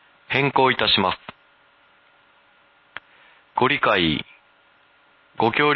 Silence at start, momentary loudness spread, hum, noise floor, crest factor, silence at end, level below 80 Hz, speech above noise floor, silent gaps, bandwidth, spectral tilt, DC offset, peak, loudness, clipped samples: 0.3 s; 23 LU; none; -57 dBFS; 18 dB; 0 s; -52 dBFS; 38 dB; none; 6 kHz; -7.5 dB/octave; under 0.1%; -4 dBFS; -20 LUFS; under 0.1%